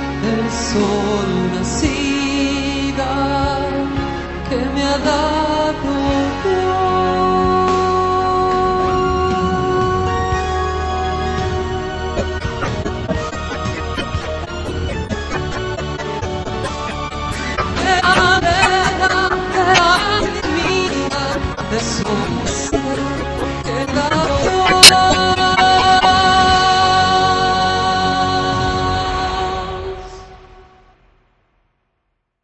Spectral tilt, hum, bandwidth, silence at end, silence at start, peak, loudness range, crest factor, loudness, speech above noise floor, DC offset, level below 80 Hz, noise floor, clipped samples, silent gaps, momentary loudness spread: -3.5 dB/octave; none; 11 kHz; 1.8 s; 0 s; 0 dBFS; 12 LU; 16 dB; -16 LUFS; 53 dB; under 0.1%; -30 dBFS; -70 dBFS; 0.2%; none; 11 LU